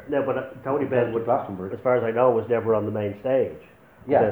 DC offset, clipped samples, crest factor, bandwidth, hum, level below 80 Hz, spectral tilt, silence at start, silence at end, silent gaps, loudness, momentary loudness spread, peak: under 0.1%; under 0.1%; 18 dB; over 20 kHz; none; -62 dBFS; -9.5 dB/octave; 0 s; 0 s; none; -24 LUFS; 9 LU; -6 dBFS